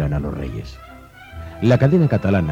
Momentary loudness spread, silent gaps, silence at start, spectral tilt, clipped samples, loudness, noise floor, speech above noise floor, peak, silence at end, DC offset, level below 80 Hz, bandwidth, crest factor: 22 LU; none; 0 s; -9 dB/octave; under 0.1%; -18 LUFS; -37 dBFS; 20 dB; -2 dBFS; 0 s; under 0.1%; -36 dBFS; 8 kHz; 16 dB